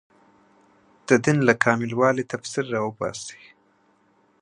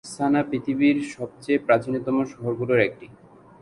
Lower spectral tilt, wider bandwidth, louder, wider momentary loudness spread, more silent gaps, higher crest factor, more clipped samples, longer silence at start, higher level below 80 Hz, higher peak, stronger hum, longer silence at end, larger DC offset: about the same, -5.5 dB/octave vs -6.5 dB/octave; about the same, 11 kHz vs 11.5 kHz; about the same, -22 LUFS vs -23 LUFS; first, 14 LU vs 7 LU; neither; about the same, 24 dB vs 20 dB; neither; first, 1.1 s vs 0.05 s; about the same, -64 dBFS vs -60 dBFS; first, 0 dBFS vs -4 dBFS; neither; first, 1.05 s vs 0.5 s; neither